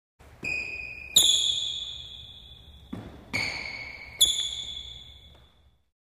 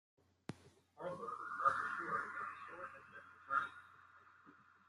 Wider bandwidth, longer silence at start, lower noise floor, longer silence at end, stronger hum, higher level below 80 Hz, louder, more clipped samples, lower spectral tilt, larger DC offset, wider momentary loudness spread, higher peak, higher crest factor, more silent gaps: first, 15.5 kHz vs 12 kHz; second, 0.2 s vs 0.5 s; second, -61 dBFS vs -66 dBFS; first, 0.85 s vs 0.25 s; neither; first, -54 dBFS vs -88 dBFS; first, -25 LUFS vs -42 LUFS; neither; second, 0.5 dB/octave vs -5 dB/octave; neither; about the same, 23 LU vs 25 LU; first, -6 dBFS vs -20 dBFS; about the same, 24 dB vs 24 dB; neither